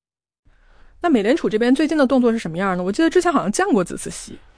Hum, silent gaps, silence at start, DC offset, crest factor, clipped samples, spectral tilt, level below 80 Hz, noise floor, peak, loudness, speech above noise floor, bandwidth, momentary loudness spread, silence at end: none; none; 1.05 s; under 0.1%; 14 dB; under 0.1%; -5 dB/octave; -48 dBFS; -49 dBFS; -6 dBFS; -18 LUFS; 31 dB; 10.5 kHz; 9 LU; 0.2 s